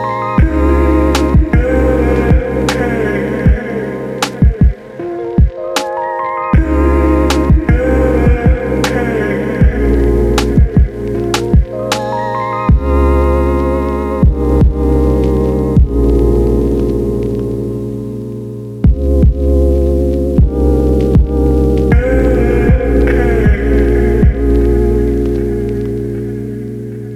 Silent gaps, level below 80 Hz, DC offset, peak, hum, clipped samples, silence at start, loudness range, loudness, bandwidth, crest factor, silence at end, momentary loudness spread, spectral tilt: none; -14 dBFS; under 0.1%; 0 dBFS; none; under 0.1%; 0 s; 3 LU; -13 LUFS; 12.5 kHz; 10 dB; 0 s; 7 LU; -7.5 dB/octave